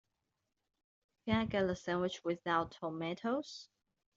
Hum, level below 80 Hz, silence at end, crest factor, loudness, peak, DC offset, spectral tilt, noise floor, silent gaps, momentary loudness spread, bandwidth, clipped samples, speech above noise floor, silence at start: none; -64 dBFS; 0.5 s; 20 dB; -37 LUFS; -20 dBFS; under 0.1%; -4.5 dB/octave; -86 dBFS; none; 10 LU; 7.8 kHz; under 0.1%; 50 dB; 1.25 s